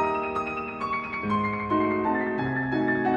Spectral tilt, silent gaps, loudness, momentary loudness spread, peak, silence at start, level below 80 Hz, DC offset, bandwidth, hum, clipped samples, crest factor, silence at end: -8 dB/octave; none; -27 LUFS; 5 LU; -14 dBFS; 0 s; -54 dBFS; under 0.1%; 8.4 kHz; none; under 0.1%; 14 dB; 0 s